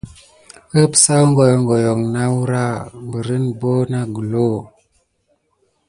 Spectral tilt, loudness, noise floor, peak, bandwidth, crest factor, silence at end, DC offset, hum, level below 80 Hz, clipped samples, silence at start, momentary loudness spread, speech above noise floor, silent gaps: -5.5 dB/octave; -16 LUFS; -64 dBFS; 0 dBFS; 11.5 kHz; 18 dB; 1.25 s; under 0.1%; none; -50 dBFS; under 0.1%; 0.05 s; 12 LU; 49 dB; none